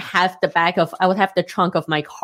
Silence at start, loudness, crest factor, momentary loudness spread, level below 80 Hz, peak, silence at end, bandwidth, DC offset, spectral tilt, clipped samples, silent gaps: 0 s; -19 LUFS; 18 dB; 3 LU; -66 dBFS; -2 dBFS; 0.05 s; 16 kHz; under 0.1%; -5.5 dB/octave; under 0.1%; none